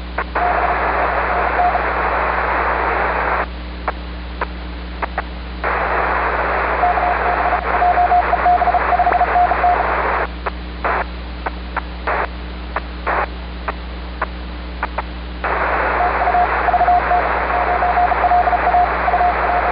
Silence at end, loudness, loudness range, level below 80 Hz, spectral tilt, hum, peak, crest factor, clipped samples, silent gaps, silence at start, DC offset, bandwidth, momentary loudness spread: 0 s; -17 LUFS; 8 LU; -28 dBFS; -10.5 dB/octave; none; -4 dBFS; 14 dB; under 0.1%; none; 0 s; under 0.1%; 5.2 kHz; 12 LU